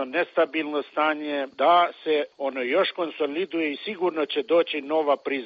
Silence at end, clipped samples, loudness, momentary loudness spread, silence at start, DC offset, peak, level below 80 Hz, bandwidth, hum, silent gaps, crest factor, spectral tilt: 0 s; under 0.1%; -24 LUFS; 8 LU; 0 s; under 0.1%; -8 dBFS; -78 dBFS; 5.6 kHz; none; none; 16 dB; -1 dB/octave